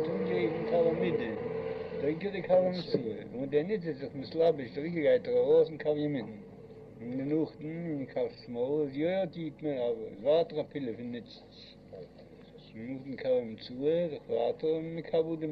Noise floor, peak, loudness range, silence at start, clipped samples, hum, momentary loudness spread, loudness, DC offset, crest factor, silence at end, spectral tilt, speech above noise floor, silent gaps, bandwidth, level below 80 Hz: -53 dBFS; -14 dBFS; 6 LU; 0 s; under 0.1%; none; 18 LU; -32 LUFS; under 0.1%; 18 dB; 0 s; -9 dB/octave; 21 dB; none; 5.6 kHz; -66 dBFS